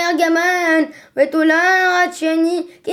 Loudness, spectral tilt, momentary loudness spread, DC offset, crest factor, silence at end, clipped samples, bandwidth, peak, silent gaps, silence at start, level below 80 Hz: -15 LUFS; -2 dB/octave; 7 LU; under 0.1%; 14 dB; 0 s; under 0.1%; 15.5 kHz; -2 dBFS; none; 0 s; -70 dBFS